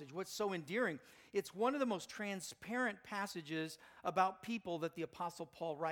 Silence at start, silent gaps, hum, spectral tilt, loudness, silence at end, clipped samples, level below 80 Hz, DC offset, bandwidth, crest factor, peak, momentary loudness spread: 0 s; none; none; -4.5 dB/octave; -41 LUFS; 0 s; under 0.1%; -80 dBFS; under 0.1%; 19 kHz; 22 dB; -20 dBFS; 9 LU